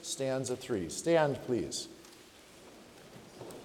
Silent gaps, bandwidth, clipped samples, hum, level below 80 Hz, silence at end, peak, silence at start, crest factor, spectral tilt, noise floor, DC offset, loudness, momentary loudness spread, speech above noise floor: none; 18 kHz; under 0.1%; none; -68 dBFS; 0 s; -16 dBFS; 0 s; 20 dB; -4.5 dB/octave; -56 dBFS; under 0.1%; -33 LUFS; 25 LU; 23 dB